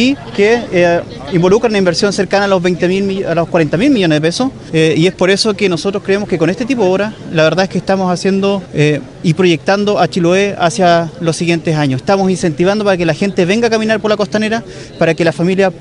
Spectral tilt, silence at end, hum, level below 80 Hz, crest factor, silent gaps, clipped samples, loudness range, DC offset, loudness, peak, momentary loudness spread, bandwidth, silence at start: -5.5 dB/octave; 0 s; none; -42 dBFS; 12 dB; none; under 0.1%; 1 LU; under 0.1%; -13 LUFS; 0 dBFS; 4 LU; 11 kHz; 0 s